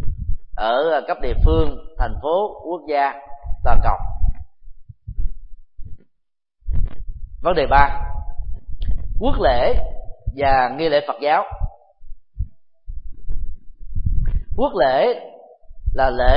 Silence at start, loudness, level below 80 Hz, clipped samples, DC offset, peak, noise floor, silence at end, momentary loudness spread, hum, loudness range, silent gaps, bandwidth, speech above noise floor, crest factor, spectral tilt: 0 s; -21 LUFS; -24 dBFS; under 0.1%; under 0.1%; 0 dBFS; -70 dBFS; 0 s; 18 LU; none; 8 LU; none; 5.2 kHz; 54 dB; 18 dB; -10.5 dB/octave